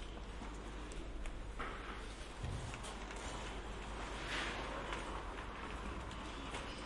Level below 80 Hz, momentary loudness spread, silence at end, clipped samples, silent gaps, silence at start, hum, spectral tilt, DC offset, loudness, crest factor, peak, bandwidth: -50 dBFS; 7 LU; 0 s; under 0.1%; none; 0 s; none; -4 dB/octave; under 0.1%; -46 LUFS; 18 dB; -28 dBFS; 11.5 kHz